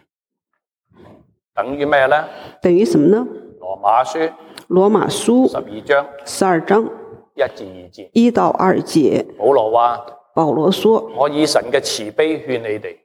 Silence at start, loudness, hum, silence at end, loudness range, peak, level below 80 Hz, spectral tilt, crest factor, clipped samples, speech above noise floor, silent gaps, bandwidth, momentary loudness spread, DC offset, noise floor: 1.55 s; -16 LUFS; none; 0.1 s; 2 LU; -2 dBFS; -58 dBFS; -5 dB/octave; 16 dB; under 0.1%; 61 dB; none; 16 kHz; 13 LU; under 0.1%; -77 dBFS